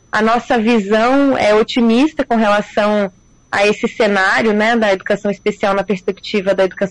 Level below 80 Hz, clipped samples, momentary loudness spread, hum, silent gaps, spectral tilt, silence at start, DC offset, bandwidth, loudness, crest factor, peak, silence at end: -46 dBFS; under 0.1%; 6 LU; none; none; -5 dB/octave; 0.15 s; under 0.1%; 11 kHz; -14 LUFS; 8 dB; -6 dBFS; 0 s